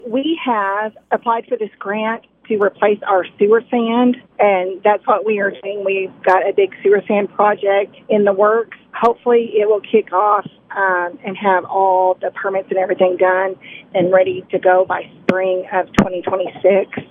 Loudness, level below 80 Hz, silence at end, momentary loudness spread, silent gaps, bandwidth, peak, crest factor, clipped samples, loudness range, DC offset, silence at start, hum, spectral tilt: -16 LUFS; -52 dBFS; 0.05 s; 7 LU; none; 7.4 kHz; 0 dBFS; 16 dB; under 0.1%; 2 LU; under 0.1%; 0.05 s; none; -7 dB/octave